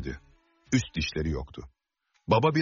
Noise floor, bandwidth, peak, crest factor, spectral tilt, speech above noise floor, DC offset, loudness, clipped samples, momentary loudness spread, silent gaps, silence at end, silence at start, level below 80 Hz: -75 dBFS; 7.2 kHz; -10 dBFS; 20 dB; -5 dB/octave; 48 dB; under 0.1%; -29 LUFS; under 0.1%; 21 LU; none; 0 s; 0 s; -44 dBFS